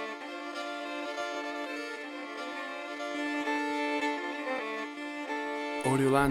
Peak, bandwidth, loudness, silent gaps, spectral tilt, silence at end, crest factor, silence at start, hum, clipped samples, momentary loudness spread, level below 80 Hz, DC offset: -12 dBFS; 16 kHz; -34 LUFS; none; -5 dB/octave; 0 s; 22 dB; 0 s; none; under 0.1%; 9 LU; -64 dBFS; under 0.1%